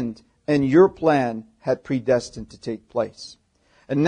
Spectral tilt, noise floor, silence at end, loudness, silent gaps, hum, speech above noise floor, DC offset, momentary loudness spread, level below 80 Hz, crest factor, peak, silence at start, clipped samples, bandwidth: -7 dB/octave; -55 dBFS; 0 s; -22 LUFS; none; none; 33 dB; under 0.1%; 18 LU; -54 dBFS; 18 dB; -4 dBFS; 0 s; under 0.1%; 9.8 kHz